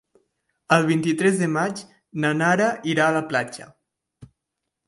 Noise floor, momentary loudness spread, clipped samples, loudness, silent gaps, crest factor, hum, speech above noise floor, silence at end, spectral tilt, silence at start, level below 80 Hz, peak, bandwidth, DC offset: -82 dBFS; 14 LU; under 0.1%; -21 LUFS; none; 20 dB; none; 61 dB; 0.6 s; -5.5 dB/octave; 0.7 s; -66 dBFS; -4 dBFS; 11.5 kHz; under 0.1%